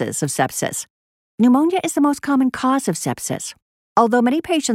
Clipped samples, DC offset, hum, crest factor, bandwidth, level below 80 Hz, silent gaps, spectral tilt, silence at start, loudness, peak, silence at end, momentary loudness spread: under 0.1%; under 0.1%; none; 18 dB; 16 kHz; -60 dBFS; 0.90-1.38 s, 3.62-3.96 s; -4.5 dB/octave; 0 s; -19 LUFS; 0 dBFS; 0 s; 10 LU